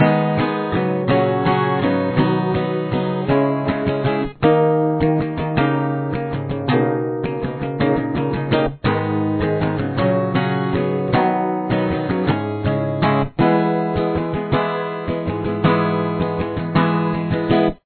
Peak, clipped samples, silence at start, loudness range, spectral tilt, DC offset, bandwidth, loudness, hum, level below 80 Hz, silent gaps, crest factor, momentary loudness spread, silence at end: -2 dBFS; under 0.1%; 0 s; 2 LU; -11.5 dB/octave; under 0.1%; 4.5 kHz; -19 LUFS; none; -40 dBFS; none; 16 dB; 5 LU; 0.1 s